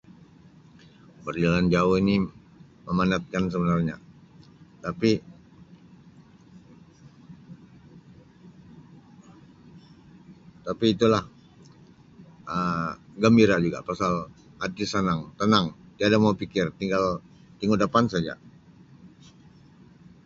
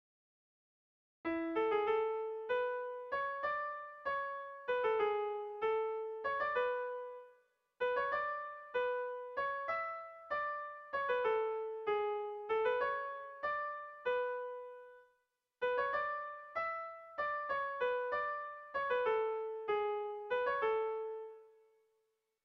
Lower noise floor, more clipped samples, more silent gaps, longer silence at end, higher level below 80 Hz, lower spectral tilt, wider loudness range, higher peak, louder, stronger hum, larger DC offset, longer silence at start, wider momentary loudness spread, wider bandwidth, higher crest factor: second, -53 dBFS vs -82 dBFS; neither; neither; first, 1.2 s vs 1 s; first, -52 dBFS vs -76 dBFS; first, -6.5 dB/octave vs -0.5 dB/octave; first, 9 LU vs 3 LU; first, -6 dBFS vs -24 dBFS; first, -25 LUFS vs -38 LUFS; neither; neither; about the same, 1.25 s vs 1.25 s; first, 15 LU vs 9 LU; first, 7.8 kHz vs 6 kHz; first, 22 dB vs 16 dB